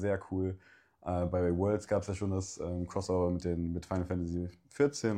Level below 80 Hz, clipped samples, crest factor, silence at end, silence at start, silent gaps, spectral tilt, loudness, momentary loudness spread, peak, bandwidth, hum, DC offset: -52 dBFS; under 0.1%; 16 dB; 0 s; 0 s; none; -7 dB/octave; -34 LUFS; 7 LU; -16 dBFS; 10.5 kHz; none; under 0.1%